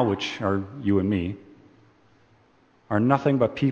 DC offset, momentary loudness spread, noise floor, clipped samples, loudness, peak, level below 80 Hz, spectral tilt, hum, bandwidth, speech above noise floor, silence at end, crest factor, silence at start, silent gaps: under 0.1%; 7 LU; -60 dBFS; under 0.1%; -24 LUFS; -4 dBFS; -56 dBFS; -7.5 dB/octave; none; 7.4 kHz; 37 dB; 0 s; 22 dB; 0 s; none